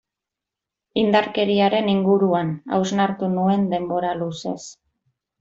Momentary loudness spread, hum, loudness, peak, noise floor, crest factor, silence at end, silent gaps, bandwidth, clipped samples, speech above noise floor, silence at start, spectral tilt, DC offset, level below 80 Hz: 10 LU; none; -21 LUFS; -4 dBFS; -86 dBFS; 18 dB; 0.7 s; none; 7.8 kHz; under 0.1%; 66 dB; 0.95 s; -6 dB/octave; under 0.1%; -62 dBFS